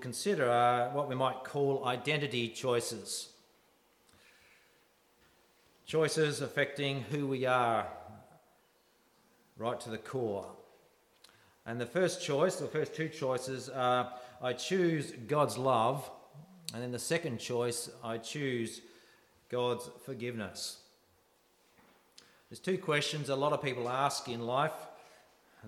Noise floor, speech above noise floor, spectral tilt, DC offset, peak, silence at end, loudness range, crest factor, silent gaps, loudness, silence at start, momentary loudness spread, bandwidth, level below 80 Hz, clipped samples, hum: -70 dBFS; 36 dB; -4.5 dB/octave; under 0.1%; -16 dBFS; 0 s; 8 LU; 20 dB; none; -34 LUFS; 0 s; 12 LU; 16 kHz; -78 dBFS; under 0.1%; none